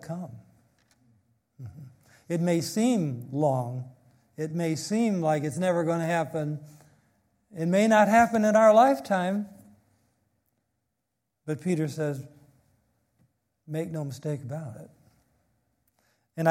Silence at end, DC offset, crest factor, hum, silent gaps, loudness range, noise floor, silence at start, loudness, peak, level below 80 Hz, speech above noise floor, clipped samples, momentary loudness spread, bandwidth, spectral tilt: 0 s; under 0.1%; 20 dB; none; none; 14 LU; -82 dBFS; 0.05 s; -26 LUFS; -8 dBFS; -70 dBFS; 57 dB; under 0.1%; 23 LU; 16.5 kHz; -6.5 dB/octave